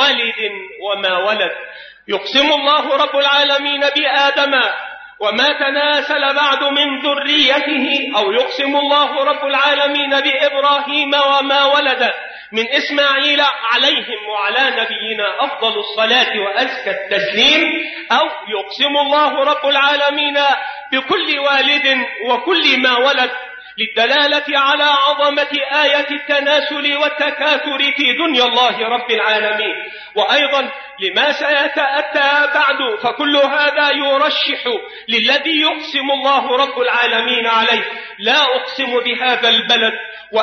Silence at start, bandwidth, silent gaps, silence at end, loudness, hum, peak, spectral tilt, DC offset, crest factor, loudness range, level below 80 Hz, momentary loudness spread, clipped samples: 0 s; 6.6 kHz; none; 0 s; -14 LUFS; none; -2 dBFS; -2 dB/octave; under 0.1%; 14 dB; 1 LU; -62 dBFS; 7 LU; under 0.1%